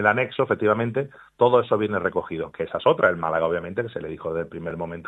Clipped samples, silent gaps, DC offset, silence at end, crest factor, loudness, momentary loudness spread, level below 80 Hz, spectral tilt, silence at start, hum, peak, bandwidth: under 0.1%; none; under 0.1%; 0 s; 18 dB; -23 LUFS; 12 LU; -60 dBFS; -8 dB/octave; 0 s; none; -4 dBFS; 4.1 kHz